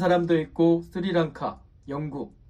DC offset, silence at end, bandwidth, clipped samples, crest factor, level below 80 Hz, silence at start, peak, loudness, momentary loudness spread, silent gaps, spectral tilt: under 0.1%; 0.2 s; 7.4 kHz; under 0.1%; 14 dB; -54 dBFS; 0 s; -10 dBFS; -25 LUFS; 13 LU; none; -8 dB/octave